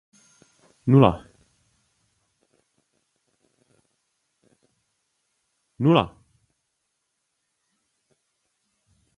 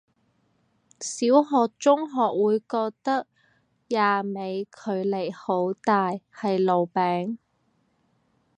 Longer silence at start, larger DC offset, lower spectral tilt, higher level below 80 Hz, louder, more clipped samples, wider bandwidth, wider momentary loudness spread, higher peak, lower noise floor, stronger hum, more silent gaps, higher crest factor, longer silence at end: second, 0.85 s vs 1 s; neither; first, -8.5 dB/octave vs -5.5 dB/octave; first, -54 dBFS vs -78 dBFS; first, -20 LUFS vs -25 LUFS; neither; about the same, 10.5 kHz vs 10.5 kHz; first, 16 LU vs 10 LU; first, 0 dBFS vs -4 dBFS; first, -77 dBFS vs -69 dBFS; neither; neither; first, 28 dB vs 20 dB; first, 3.1 s vs 1.25 s